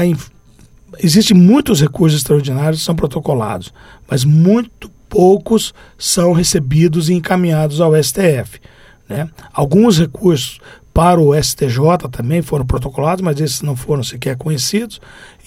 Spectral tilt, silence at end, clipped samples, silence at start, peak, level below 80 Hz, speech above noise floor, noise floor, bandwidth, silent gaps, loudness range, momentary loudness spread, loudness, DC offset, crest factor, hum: -5.5 dB/octave; 0.2 s; under 0.1%; 0 s; 0 dBFS; -34 dBFS; 31 dB; -44 dBFS; 16 kHz; none; 3 LU; 11 LU; -13 LUFS; under 0.1%; 14 dB; none